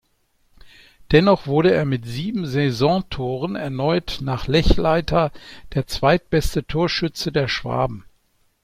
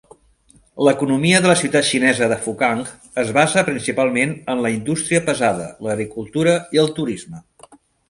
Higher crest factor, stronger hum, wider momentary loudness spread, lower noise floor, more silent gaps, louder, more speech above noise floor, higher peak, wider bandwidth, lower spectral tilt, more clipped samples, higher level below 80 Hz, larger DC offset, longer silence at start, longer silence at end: about the same, 18 dB vs 18 dB; neither; about the same, 9 LU vs 10 LU; first, -64 dBFS vs -54 dBFS; neither; about the same, -20 LUFS vs -18 LUFS; first, 44 dB vs 36 dB; about the same, -2 dBFS vs 0 dBFS; first, 16 kHz vs 11.5 kHz; first, -6.5 dB/octave vs -4 dB/octave; neither; first, -32 dBFS vs -54 dBFS; neither; about the same, 0.65 s vs 0.75 s; first, 0.65 s vs 0.35 s